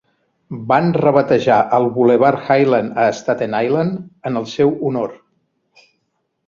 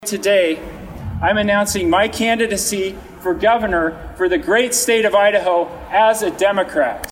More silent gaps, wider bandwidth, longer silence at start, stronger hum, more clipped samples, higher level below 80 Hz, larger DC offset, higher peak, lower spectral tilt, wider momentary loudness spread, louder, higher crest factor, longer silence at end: neither; second, 7.4 kHz vs 16.5 kHz; first, 0.5 s vs 0 s; neither; neither; second, -58 dBFS vs -40 dBFS; neither; first, 0 dBFS vs -4 dBFS; first, -7 dB/octave vs -3 dB/octave; about the same, 10 LU vs 9 LU; about the same, -16 LUFS vs -16 LUFS; about the same, 16 dB vs 14 dB; first, 1.35 s vs 0 s